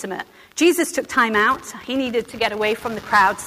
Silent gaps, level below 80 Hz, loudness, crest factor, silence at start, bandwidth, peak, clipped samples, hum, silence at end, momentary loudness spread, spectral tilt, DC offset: none; -54 dBFS; -19 LUFS; 14 dB; 0 s; 16 kHz; -6 dBFS; under 0.1%; none; 0 s; 10 LU; -3 dB/octave; under 0.1%